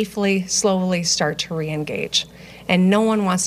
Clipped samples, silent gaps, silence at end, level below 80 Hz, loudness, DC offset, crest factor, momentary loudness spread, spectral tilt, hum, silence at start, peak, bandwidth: under 0.1%; none; 0 s; -54 dBFS; -19 LUFS; under 0.1%; 16 dB; 8 LU; -4 dB/octave; none; 0 s; -4 dBFS; 15 kHz